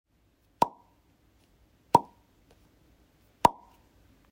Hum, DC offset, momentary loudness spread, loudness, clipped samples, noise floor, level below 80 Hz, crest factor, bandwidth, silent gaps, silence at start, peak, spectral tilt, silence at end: none; under 0.1%; 4 LU; -27 LUFS; under 0.1%; -68 dBFS; -62 dBFS; 30 dB; 16 kHz; none; 0.6 s; -2 dBFS; -5 dB/octave; 0.8 s